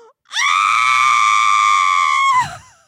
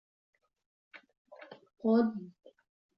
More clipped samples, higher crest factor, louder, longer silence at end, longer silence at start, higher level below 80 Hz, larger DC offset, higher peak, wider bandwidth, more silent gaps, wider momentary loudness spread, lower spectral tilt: neither; second, 12 dB vs 20 dB; first, -13 LUFS vs -30 LUFS; second, 0.3 s vs 0.7 s; second, 0.3 s vs 0.95 s; first, -60 dBFS vs -84 dBFS; neither; first, -4 dBFS vs -16 dBFS; first, 14 kHz vs 5.6 kHz; second, none vs 1.17-1.25 s; second, 6 LU vs 25 LU; second, 1.5 dB/octave vs -10 dB/octave